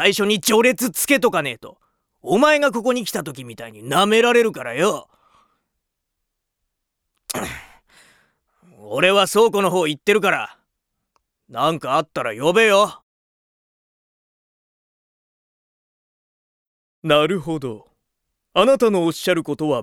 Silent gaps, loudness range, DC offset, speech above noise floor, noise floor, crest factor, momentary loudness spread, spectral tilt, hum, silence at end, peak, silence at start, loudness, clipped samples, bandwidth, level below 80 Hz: 13.02-17.02 s; 10 LU; under 0.1%; 60 dB; -78 dBFS; 20 dB; 17 LU; -3.5 dB/octave; none; 0 s; 0 dBFS; 0 s; -18 LUFS; under 0.1%; over 20 kHz; -60 dBFS